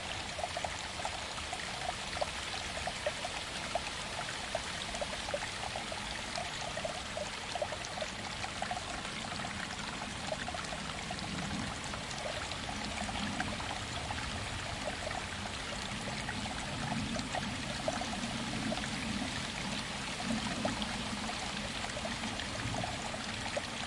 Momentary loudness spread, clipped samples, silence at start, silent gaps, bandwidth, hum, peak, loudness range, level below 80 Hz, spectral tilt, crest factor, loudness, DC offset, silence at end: 3 LU; under 0.1%; 0 s; none; 11.5 kHz; none; -18 dBFS; 2 LU; -52 dBFS; -3 dB/octave; 20 dB; -37 LUFS; under 0.1%; 0 s